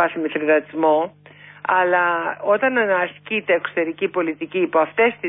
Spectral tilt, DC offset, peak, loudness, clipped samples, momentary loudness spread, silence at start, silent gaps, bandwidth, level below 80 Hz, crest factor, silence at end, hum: -9.5 dB/octave; under 0.1%; -6 dBFS; -20 LUFS; under 0.1%; 6 LU; 0 s; none; 3.9 kHz; -70 dBFS; 14 dB; 0 s; 50 Hz at -50 dBFS